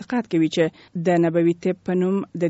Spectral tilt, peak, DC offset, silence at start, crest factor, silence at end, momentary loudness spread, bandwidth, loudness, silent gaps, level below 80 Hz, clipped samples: -6.5 dB/octave; -6 dBFS; under 0.1%; 0 s; 14 dB; 0 s; 5 LU; 8 kHz; -21 LUFS; none; -64 dBFS; under 0.1%